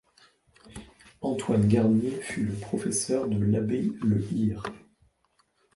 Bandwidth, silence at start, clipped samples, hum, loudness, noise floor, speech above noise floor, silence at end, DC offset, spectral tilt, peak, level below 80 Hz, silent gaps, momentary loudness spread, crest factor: 11.5 kHz; 0.65 s; under 0.1%; none; -27 LUFS; -70 dBFS; 44 dB; 1 s; under 0.1%; -6.5 dB/octave; -10 dBFS; -54 dBFS; none; 17 LU; 18 dB